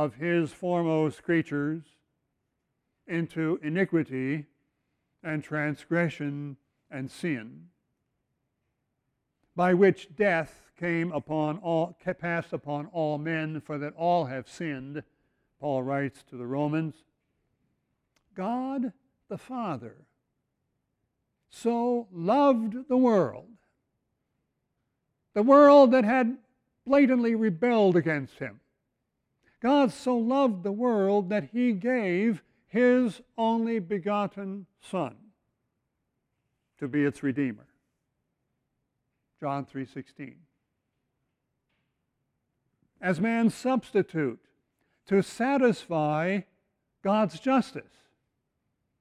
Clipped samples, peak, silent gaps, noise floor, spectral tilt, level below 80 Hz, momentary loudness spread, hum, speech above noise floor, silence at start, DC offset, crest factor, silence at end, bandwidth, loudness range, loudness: under 0.1%; -8 dBFS; none; -80 dBFS; -7.5 dB/octave; -70 dBFS; 16 LU; none; 54 dB; 0 s; under 0.1%; 20 dB; 1.2 s; 11.5 kHz; 14 LU; -27 LUFS